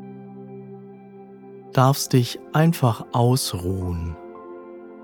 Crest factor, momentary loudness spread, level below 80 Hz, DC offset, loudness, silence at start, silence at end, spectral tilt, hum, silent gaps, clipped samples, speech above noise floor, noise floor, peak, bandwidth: 20 dB; 24 LU; -46 dBFS; under 0.1%; -21 LUFS; 0 s; 0 s; -6 dB/octave; none; none; under 0.1%; 23 dB; -43 dBFS; -4 dBFS; 19 kHz